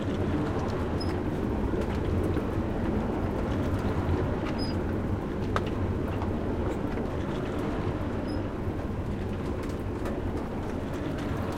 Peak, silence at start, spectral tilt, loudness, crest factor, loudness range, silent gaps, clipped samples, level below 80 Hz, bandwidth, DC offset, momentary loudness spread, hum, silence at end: -10 dBFS; 0 s; -8 dB/octave; -31 LUFS; 20 dB; 3 LU; none; under 0.1%; -38 dBFS; 15.5 kHz; under 0.1%; 4 LU; none; 0 s